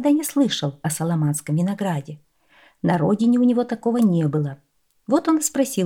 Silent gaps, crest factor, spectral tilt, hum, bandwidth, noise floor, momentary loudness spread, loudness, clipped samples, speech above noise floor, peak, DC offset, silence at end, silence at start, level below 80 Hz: none; 14 dB; -6 dB/octave; none; 18 kHz; -56 dBFS; 8 LU; -21 LUFS; under 0.1%; 36 dB; -6 dBFS; under 0.1%; 0 s; 0 s; -64 dBFS